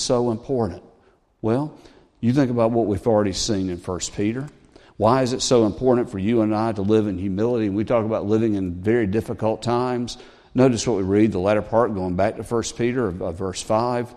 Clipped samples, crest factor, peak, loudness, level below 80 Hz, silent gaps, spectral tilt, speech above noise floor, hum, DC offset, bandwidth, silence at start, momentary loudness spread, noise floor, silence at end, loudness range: under 0.1%; 18 dB; -2 dBFS; -22 LUFS; -48 dBFS; none; -6 dB/octave; 37 dB; none; under 0.1%; 12.5 kHz; 0 s; 9 LU; -58 dBFS; 0 s; 2 LU